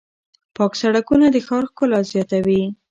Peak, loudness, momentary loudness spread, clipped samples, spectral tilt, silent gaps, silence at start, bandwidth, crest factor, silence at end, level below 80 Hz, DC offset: -4 dBFS; -18 LUFS; 7 LU; under 0.1%; -6.5 dB/octave; none; 0.6 s; 7.8 kHz; 14 dB; 0.15 s; -52 dBFS; under 0.1%